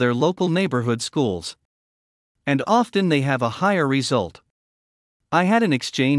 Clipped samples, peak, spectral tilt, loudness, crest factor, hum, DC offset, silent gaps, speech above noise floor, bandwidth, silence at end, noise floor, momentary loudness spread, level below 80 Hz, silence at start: under 0.1%; -4 dBFS; -5.5 dB/octave; -21 LUFS; 16 dB; none; under 0.1%; 1.65-2.35 s, 4.50-5.20 s; over 70 dB; 12 kHz; 0 s; under -90 dBFS; 6 LU; -64 dBFS; 0 s